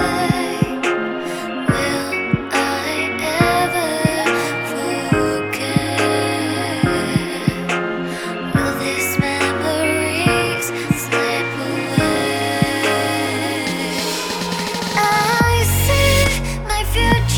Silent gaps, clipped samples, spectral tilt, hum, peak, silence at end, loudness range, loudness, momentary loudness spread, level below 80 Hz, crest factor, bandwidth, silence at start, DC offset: none; under 0.1%; -4.5 dB/octave; none; 0 dBFS; 0 s; 3 LU; -18 LUFS; 6 LU; -32 dBFS; 18 dB; 19 kHz; 0 s; under 0.1%